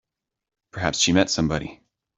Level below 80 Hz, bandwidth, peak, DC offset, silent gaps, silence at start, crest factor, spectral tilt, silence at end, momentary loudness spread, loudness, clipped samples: -48 dBFS; 8.2 kHz; -4 dBFS; under 0.1%; none; 0.75 s; 22 dB; -3.5 dB/octave; 0.45 s; 18 LU; -22 LUFS; under 0.1%